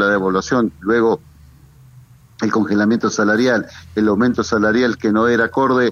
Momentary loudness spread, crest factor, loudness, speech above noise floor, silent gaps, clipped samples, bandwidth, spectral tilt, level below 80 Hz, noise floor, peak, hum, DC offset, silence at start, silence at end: 5 LU; 12 dB; -17 LUFS; 29 dB; none; under 0.1%; 7.4 kHz; -5.5 dB/octave; -48 dBFS; -45 dBFS; -4 dBFS; none; under 0.1%; 0 s; 0 s